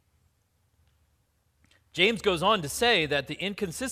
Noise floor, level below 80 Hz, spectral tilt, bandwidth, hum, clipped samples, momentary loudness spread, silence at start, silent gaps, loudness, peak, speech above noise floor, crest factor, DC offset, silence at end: -70 dBFS; -56 dBFS; -3.5 dB/octave; 15.5 kHz; none; under 0.1%; 9 LU; 1.95 s; none; -25 LUFS; -6 dBFS; 44 dB; 24 dB; under 0.1%; 0 s